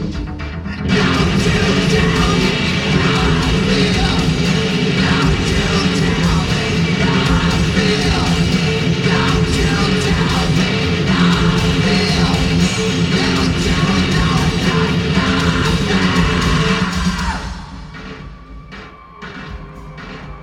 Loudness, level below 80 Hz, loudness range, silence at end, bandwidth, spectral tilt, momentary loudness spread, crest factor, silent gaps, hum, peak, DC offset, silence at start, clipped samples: -15 LUFS; -26 dBFS; 3 LU; 0 s; 13 kHz; -5 dB/octave; 17 LU; 14 dB; none; none; 0 dBFS; under 0.1%; 0 s; under 0.1%